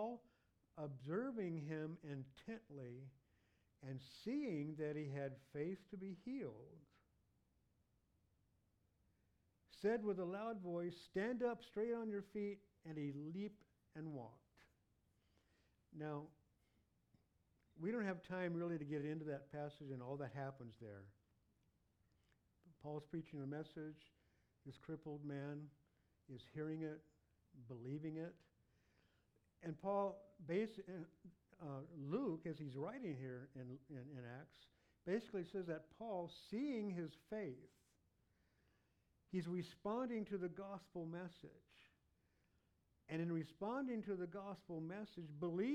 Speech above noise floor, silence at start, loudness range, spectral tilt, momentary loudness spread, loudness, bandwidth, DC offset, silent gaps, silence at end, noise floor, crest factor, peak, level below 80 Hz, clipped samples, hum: 34 dB; 0 s; 8 LU; -8 dB/octave; 14 LU; -48 LUFS; 13 kHz; under 0.1%; none; 0 s; -81 dBFS; 20 dB; -30 dBFS; -82 dBFS; under 0.1%; none